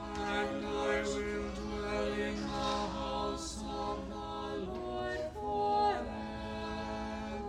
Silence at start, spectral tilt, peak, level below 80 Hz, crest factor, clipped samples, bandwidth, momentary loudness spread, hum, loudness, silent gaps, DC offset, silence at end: 0 s; -4.5 dB/octave; -20 dBFS; -50 dBFS; 16 dB; under 0.1%; 13 kHz; 7 LU; none; -36 LUFS; none; under 0.1%; 0 s